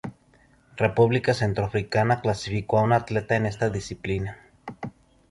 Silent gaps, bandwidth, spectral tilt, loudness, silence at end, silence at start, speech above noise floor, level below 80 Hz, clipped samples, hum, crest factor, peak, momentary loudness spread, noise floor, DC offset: none; 11.5 kHz; -6.5 dB/octave; -24 LUFS; 0.4 s; 0.05 s; 35 dB; -48 dBFS; under 0.1%; none; 18 dB; -6 dBFS; 19 LU; -59 dBFS; under 0.1%